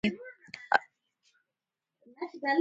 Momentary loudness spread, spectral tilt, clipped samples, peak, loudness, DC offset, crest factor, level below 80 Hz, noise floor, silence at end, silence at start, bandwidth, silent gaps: 17 LU; -5.5 dB/octave; under 0.1%; -6 dBFS; -32 LUFS; under 0.1%; 28 dB; -70 dBFS; -89 dBFS; 0 s; 0.05 s; 9 kHz; none